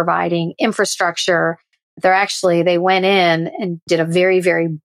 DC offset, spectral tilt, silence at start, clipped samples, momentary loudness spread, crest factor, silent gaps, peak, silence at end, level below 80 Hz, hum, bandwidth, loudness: under 0.1%; -4.5 dB/octave; 0 s; under 0.1%; 6 LU; 12 dB; 1.83-1.97 s, 3.82-3.87 s; -4 dBFS; 0.05 s; -68 dBFS; none; 14.5 kHz; -16 LUFS